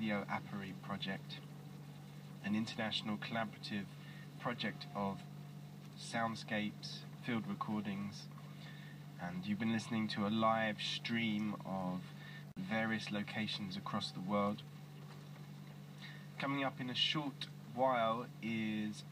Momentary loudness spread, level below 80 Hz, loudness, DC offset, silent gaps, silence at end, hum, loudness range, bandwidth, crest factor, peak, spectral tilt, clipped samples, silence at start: 17 LU; -80 dBFS; -40 LUFS; under 0.1%; none; 0 s; none; 5 LU; 15.5 kHz; 20 dB; -22 dBFS; -5.5 dB/octave; under 0.1%; 0 s